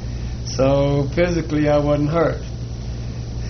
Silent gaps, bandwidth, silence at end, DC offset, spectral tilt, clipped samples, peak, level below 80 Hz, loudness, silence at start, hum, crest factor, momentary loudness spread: none; 6.6 kHz; 0 s; under 0.1%; -6.5 dB/octave; under 0.1%; -6 dBFS; -30 dBFS; -20 LUFS; 0 s; none; 14 dB; 12 LU